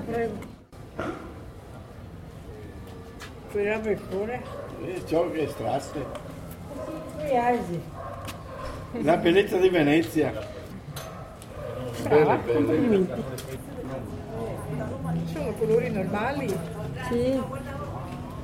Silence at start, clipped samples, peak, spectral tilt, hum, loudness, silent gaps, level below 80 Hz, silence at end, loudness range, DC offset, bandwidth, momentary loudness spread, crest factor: 0 s; under 0.1%; -8 dBFS; -6.5 dB/octave; none; -27 LUFS; none; -48 dBFS; 0 s; 8 LU; under 0.1%; 16 kHz; 20 LU; 20 dB